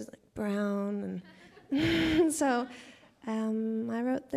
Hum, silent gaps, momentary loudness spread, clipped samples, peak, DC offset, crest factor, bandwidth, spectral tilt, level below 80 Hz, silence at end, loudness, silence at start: none; none; 16 LU; under 0.1%; -16 dBFS; under 0.1%; 16 dB; 15.5 kHz; -5 dB/octave; -56 dBFS; 0 s; -31 LUFS; 0 s